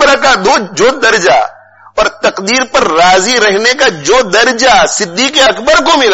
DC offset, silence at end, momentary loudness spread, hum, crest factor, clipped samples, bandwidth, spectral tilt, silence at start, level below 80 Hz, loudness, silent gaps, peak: under 0.1%; 0 s; 5 LU; none; 8 dB; under 0.1%; 9.8 kHz; -1.5 dB/octave; 0 s; -36 dBFS; -8 LUFS; none; 0 dBFS